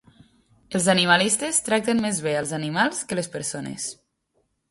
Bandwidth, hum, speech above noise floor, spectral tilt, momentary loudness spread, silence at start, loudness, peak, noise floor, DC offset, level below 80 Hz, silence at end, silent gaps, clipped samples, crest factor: 12 kHz; none; 48 dB; -3 dB/octave; 12 LU; 0.7 s; -23 LUFS; -4 dBFS; -71 dBFS; under 0.1%; -62 dBFS; 0.75 s; none; under 0.1%; 22 dB